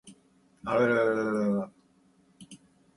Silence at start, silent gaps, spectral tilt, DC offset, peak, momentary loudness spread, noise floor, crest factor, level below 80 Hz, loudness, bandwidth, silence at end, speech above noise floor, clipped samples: 0.05 s; none; -7 dB/octave; under 0.1%; -12 dBFS; 15 LU; -64 dBFS; 20 dB; -68 dBFS; -27 LUFS; 11.5 kHz; 0.4 s; 38 dB; under 0.1%